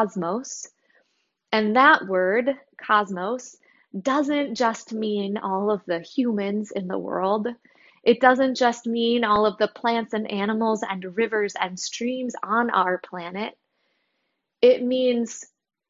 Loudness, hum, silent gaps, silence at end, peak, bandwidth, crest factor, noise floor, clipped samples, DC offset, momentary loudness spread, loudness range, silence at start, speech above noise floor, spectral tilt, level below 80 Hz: -23 LUFS; none; none; 0.45 s; -2 dBFS; 7.8 kHz; 22 dB; -76 dBFS; under 0.1%; under 0.1%; 13 LU; 4 LU; 0 s; 53 dB; -4.5 dB/octave; -66 dBFS